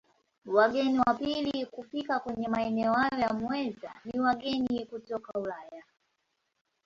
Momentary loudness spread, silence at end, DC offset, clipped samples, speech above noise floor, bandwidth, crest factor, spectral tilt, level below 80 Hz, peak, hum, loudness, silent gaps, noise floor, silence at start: 12 LU; 1.05 s; under 0.1%; under 0.1%; 49 dB; 7.4 kHz; 20 dB; -6 dB/octave; -64 dBFS; -10 dBFS; none; -30 LUFS; none; -79 dBFS; 0.45 s